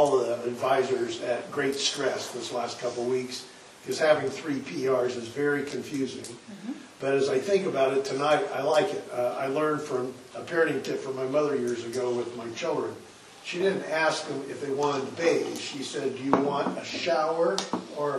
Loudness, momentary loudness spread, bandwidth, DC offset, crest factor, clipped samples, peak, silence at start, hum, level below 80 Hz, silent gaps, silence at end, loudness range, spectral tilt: -28 LUFS; 10 LU; 12.5 kHz; under 0.1%; 22 dB; under 0.1%; -6 dBFS; 0 s; none; -72 dBFS; none; 0 s; 3 LU; -4 dB/octave